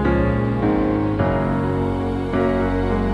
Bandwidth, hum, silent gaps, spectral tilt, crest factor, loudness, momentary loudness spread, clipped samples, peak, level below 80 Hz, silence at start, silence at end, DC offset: 10 kHz; none; none; -9 dB/octave; 12 dB; -20 LUFS; 3 LU; under 0.1%; -6 dBFS; -30 dBFS; 0 s; 0 s; under 0.1%